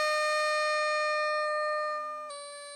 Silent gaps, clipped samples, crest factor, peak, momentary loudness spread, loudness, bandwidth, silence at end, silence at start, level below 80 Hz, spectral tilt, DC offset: none; under 0.1%; 12 dB; -18 dBFS; 12 LU; -29 LUFS; 16 kHz; 0 s; 0 s; -82 dBFS; 3 dB/octave; under 0.1%